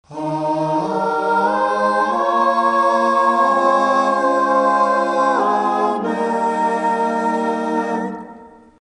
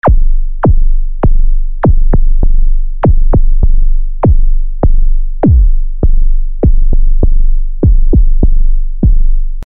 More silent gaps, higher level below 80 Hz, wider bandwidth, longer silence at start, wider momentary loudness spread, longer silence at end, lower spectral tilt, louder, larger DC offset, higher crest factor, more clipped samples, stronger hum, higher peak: neither; second, -62 dBFS vs -6 dBFS; first, 10 kHz vs 2 kHz; about the same, 0.1 s vs 0 s; about the same, 6 LU vs 7 LU; first, 0.35 s vs 0 s; second, -5.5 dB/octave vs -12.5 dB/octave; second, -17 LUFS vs -14 LUFS; second, under 0.1% vs 5%; first, 14 dB vs 6 dB; neither; neither; about the same, -2 dBFS vs 0 dBFS